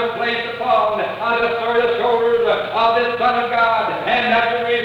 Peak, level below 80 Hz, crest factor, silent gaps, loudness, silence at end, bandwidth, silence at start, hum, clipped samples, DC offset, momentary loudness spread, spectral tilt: -6 dBFS; -54 dBFS; 12 dB; none; -17 LUFS; 0 s; 7 kHz; 0 s; none; under 0.1%; under 0.1%; 4 LU; -5 dB/octave